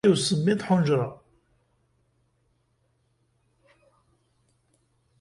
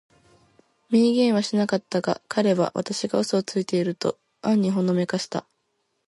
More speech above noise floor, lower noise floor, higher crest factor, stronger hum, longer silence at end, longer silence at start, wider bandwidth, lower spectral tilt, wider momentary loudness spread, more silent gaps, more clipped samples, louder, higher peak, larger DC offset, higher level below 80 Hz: about the same, 48 dB vs 51 dB; about the same, -70 dBFS vs -73 dBFS; about the same, 20 dB vs 16 dB; neither; first, 4.05 s vs 0.65 s; second, 0.05 s vs 0.9 s; about the same, 11.5 kHz vs 11.5 kHz; about the same, -5.5 dB/octave vs -5.5 dB/octave; second, 5 LU vs 8 LU; neither; neither; about the same, -24 LUFS vs -24 LUFS; about the same, -8 dBFS vs -8 dBFS; neither; first, -64 dBFS vs -70 dBFS